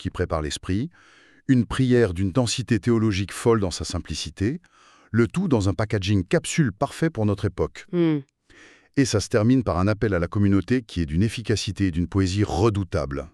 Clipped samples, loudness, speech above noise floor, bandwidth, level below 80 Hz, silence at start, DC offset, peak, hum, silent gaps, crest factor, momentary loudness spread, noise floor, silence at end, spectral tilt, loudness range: under 0.1%; -23 LUFS; 30 dB; 12.5 kHz; -42 dBFS; 0 s; under 0.1%; -6 dBFS; none; none; 16 dB; 7 LU; -52 dBFS; 0.05 s; -6 dB/octave; 2 LU